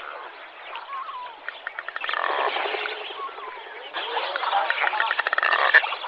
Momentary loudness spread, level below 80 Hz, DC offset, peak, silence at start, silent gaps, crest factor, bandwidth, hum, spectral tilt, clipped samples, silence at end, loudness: 17 LU; -78 dBFS; under 0.1%; -2 dBFS; 0 s; none; 24 dB; 6.8 kHz; none; -1.5 dB/octave; under 0.1%; 0 s; -24 LUFS